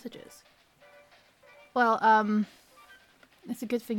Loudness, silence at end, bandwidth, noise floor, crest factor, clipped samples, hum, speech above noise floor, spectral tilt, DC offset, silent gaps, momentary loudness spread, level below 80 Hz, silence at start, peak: -26 LUFS; 0 s; 17.5 kHz; -59 dBFS; 18 dB; under 0.1%; none; 32 dB; -5.5 dB/octave; under 0.1%; none; 20 LU; -76 dBFS; 0.05 s; -12 dBFS